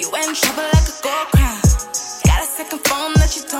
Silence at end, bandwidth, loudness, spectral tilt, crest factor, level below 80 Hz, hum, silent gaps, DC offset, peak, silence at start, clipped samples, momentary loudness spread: 0 s; 17 kHz; -17 LUFS; -4 dB/octave; 16 dB; -20 dBFS; none; none; under 0.1%; -2 dBFS; 0 s; under 0.1%; 5 LU